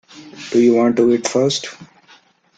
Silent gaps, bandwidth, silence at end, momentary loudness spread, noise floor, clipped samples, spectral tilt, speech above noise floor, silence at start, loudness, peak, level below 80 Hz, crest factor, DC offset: none; 9.2 kHz; 0.75 s; 14 LU; -51 dBFS; under 0.1%; -4.5 dB/octave; 36 dB; 0.15 s; -16 LUFS; -2 dBFS; -62 dBFS; 16 dB; under 0.1%